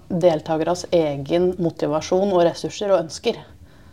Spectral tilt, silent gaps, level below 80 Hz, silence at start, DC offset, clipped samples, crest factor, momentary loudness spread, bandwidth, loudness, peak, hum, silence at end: -6 dB/octave; none; -54 dBFS; 0.1 s; 0.3%; under 0.1%; 18 dB; 7 LU; 12.5 kHz; -21 LUFS; -4 dBFS; none; 0.3 s